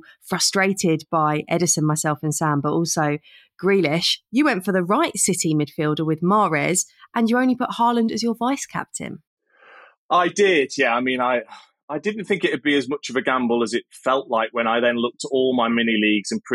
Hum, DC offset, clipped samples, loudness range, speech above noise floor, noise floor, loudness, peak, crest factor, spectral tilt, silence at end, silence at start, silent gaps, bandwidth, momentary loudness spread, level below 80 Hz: none; under 0.1%; under 0.1%; 2 LU; 28 dB; -49 dBFS; -20 LUFS; -6 dBFS; 16 dB; -4 dB/octave; 0 s; 0.25 s; 9.27-9.37 s, 9.97-10.09 s, 11.83-11.88 s; 16 kHz; 7 LU; -66 dBFS